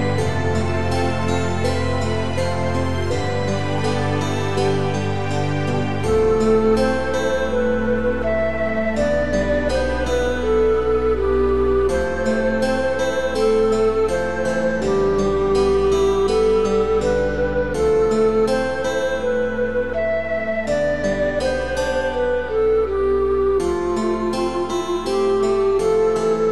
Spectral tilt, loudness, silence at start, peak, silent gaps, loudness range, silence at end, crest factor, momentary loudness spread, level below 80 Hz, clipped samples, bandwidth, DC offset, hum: -6 dB/octave; -20 LUFS; 0 s; -6 dBFS; none; 3 LU; 0 s; 12 dB; 5 LU; -34 dBFS; under 0.1%; 12 kHz; 2%; none